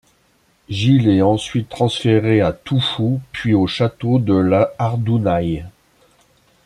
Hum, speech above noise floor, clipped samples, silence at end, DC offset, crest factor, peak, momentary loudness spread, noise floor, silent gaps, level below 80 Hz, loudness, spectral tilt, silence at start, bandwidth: none; 42 dB; under 0.1%; 0.95 s; under 0.1%; 16 dB; -2 dBFS; 6 LU; -59 dBFS; none; -46 dBFS; -17 LUFS; -7 dB/octave; 0.7 s; 11 kHz